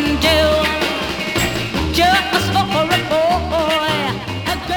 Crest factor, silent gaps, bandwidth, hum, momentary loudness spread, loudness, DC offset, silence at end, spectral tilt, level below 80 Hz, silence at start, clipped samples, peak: 16 dB; none; over 20 kHz; none; 7 LU; -16 LUFS; under 0.1%; 0 s; -4 dB/octave; -34 dBFS; 0 s; under 0.1%; -2 dBFS